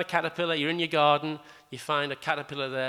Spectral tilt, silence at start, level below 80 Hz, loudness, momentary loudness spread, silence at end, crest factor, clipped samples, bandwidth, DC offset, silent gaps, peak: -5 dB/octave; 0 s; -74 dBFS; -27 LUFS; 15 LU; 0 s; 20 dB; under 0.1%; 15 kHz; under 0.1%; none; -8 dBFS